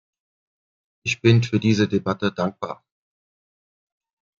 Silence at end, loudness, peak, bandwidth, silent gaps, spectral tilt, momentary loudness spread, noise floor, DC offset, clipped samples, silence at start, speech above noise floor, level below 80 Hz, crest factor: 1.65 s; -21 LUFS; -2 dBFS; 7.4 kHz; none; -6.5 dB/octave; 15 LU; under -90 dBFS; under 0.1%; under 0.1%; 1.05 s; over 70 dB; -62 dBFS; 22 dB